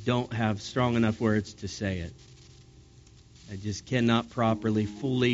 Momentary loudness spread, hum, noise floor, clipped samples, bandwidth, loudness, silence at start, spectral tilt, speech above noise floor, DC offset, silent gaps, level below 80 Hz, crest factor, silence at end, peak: 12 LU; none; -54 dBFS; under 0.1%; 8 kHz; -28 LUFS; 0 s; -5.5 dB/octave; 26 dB; under 0.1%; none; -56 dBFS; 18 dB; 0 s; -10 dBFS